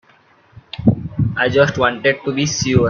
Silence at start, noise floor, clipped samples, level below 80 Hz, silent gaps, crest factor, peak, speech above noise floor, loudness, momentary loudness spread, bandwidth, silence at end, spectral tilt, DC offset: 0.75 s; -52 dBFS; under 0.1%; -42 dBFS; none; 16 dB; 0 dBFS; 36 dB; -17 LUFS; 6 LU; 7.4 kHz; 0 s; -5 dB/octave; under 0.1%